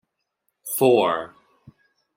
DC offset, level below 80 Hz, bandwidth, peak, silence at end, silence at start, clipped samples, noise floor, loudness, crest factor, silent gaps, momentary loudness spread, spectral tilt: under 0.1%; -70 dBFS; 16.5 kHz; -4 dBFS; 0.9 s; 0.65 s; under 0.1%; -75 dBFS; -21 LUFS; 20 dB; none; 22 LU; -4.5 dB/octave